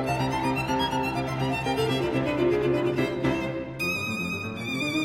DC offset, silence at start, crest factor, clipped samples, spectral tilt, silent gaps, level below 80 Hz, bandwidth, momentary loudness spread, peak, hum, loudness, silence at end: under 0.1%; 0 s; 14 dB; under 0.1%; -5.5 dB/octave; none; -48 dBFS; 16 kHz; 5 LU; -12 dBFS; none; -27 LUFS; 0 s